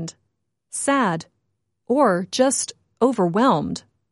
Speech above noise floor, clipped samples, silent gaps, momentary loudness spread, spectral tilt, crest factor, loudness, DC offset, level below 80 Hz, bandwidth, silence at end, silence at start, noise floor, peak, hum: 55 dB; under 0.1%; none; 12 LU; -4.5 dB/octave; 18 dB; -21 LUFS; under 0.1%; -62 dBFS; 11.5 kHz; 0.35 s; 0 s; -75 dBFS; -4 dBFS; none